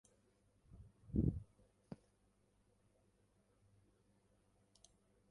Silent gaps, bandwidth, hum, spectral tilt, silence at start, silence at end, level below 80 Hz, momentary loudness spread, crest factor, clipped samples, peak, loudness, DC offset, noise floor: none; 11 kHz; 50 Hz at -75 dBFS; -9.5 dB/octave; 0.75 s; 3.35 s; -58 dBFS; 25 LU; 26 dB; under 0.1%; -24 dBFS; -42 LUFS; under 0.1%; -77 dBFS